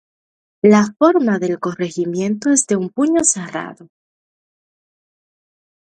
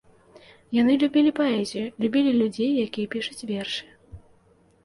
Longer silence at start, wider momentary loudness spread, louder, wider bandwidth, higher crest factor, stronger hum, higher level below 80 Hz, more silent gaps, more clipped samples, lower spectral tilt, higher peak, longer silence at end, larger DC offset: about the same, 0.65 s vs 0.7 s; about the same, 10 LU vs 10 LU; first, -16 LUFS vs -24 LUFS; about the same, 11.5 kHz vs 11.5 kHz; about the same, 18 dB vs 14 dB; neither; about the same, -64 dBFS vs -60 dBFS; neither; neither; about the same, -5 dB/octave vs -5.5 dB/octave; first, 0 dBFS vs -10 dBFS; first, 2.15 s vs 0.65 s; neither